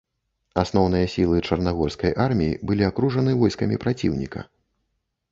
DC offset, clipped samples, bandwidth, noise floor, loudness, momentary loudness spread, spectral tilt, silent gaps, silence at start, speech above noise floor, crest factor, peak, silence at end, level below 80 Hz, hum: under 0.1%; under 0.1%; 7.8 kHz; -76 dBFS; -22 LUFS; 6 LU; -7.5 dB/octave; none; 0.55 s; 54 dB; 20 dB; -4 dBFS; 0.85 s; -40 dBFS; none